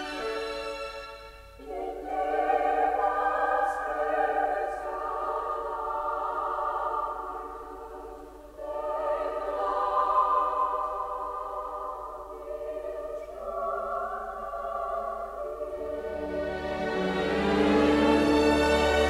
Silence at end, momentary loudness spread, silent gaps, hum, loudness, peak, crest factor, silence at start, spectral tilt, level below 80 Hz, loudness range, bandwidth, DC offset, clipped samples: 0 s; 16 LU; none; none; -29 LUFS; -10 dBFS; 18 dB; 0 s; -5.5 dB/octave; -48 dBFS; 7 LU; 15 kHz; under 0.1%; under 0.1%